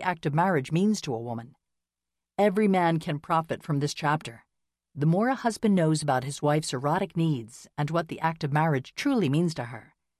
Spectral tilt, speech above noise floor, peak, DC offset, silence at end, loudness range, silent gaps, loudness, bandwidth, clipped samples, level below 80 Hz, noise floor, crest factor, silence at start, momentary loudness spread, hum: -6 dB/octave; 62 dB; -10 dBFS; under 0.1%; 0.4 s; 1 LU; none; -27 LUFS; 13.5 kHz; under 0.1%; -64 dBFS; -88 dBFS; 16 dB; 0 s; 11 LU; none